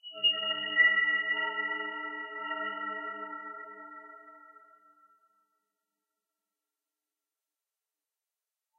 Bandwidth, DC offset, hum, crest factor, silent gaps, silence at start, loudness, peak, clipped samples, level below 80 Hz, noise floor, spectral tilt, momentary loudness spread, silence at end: 3.2 kHz; under 0.1%; none; 22 dB; none; 0.05 s; -29 LUFS; -14 dBFS; under 0.1%; under -90 dBFS; under -90 dBFS; -3.5 dB/octave; 22 LU; 4.25 s